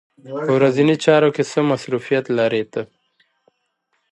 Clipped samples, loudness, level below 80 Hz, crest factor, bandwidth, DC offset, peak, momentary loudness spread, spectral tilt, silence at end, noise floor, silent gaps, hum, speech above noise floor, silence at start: under 0.1%; -18 LUFS; -66 dBFS; 18 dB; 11 kHz; under 0.1%; -2 dBFS; 14 LU; -6 dB/octave; 1.3 s; -70 dBFS; none; none; 52 dB; 0.25 s